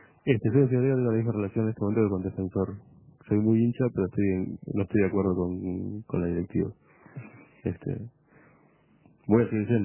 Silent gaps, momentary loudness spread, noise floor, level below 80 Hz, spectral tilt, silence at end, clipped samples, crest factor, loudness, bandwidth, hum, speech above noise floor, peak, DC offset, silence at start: none; 12 LU; -61 dBFS; -50 dBFS; -13 dB/octave; 0 s; under 0.1%; 20 dB; -27 LUFS; 3.2 kHz; none; 35 dB; -8 dBFS; under 0.1%; 0.25 s